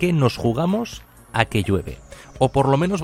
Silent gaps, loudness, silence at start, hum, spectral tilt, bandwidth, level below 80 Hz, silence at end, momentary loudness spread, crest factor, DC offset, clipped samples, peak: none; -21 LUFS; 0 s; none; -6.5 dB/octave; 15.5 kHz; -42 dBFS; 0 s; 15 LU; 20 dB; under 0.1%; under 0.1%; 0 dBFS